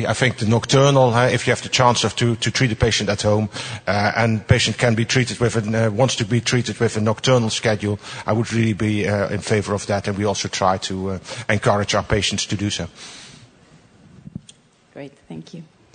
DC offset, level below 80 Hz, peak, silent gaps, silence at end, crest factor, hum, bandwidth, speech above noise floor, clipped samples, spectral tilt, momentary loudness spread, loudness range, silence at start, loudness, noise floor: under 0.1%; -46 dBFS; 0 dBFS; none; 0.3 s; 18 dB; none; 9.6 kHz; 31 dB; under 0.1%; -4.5 dB/octave; 19 LU; 6 LU; 0 s; -19 LUFS; -50 dBFS